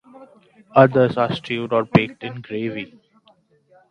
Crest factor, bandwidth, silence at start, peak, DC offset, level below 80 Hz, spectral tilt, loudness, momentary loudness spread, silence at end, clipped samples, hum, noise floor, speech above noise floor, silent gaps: 20 dB; 9.4 kHz; 0.15 s; 0 dBFS; under 0.1%; -56 dBFS; -8 dB/octave; -19 LUFS; 17 LU; 1.05 s; under 0.1%; none; -58 dBFS; 39 dB; none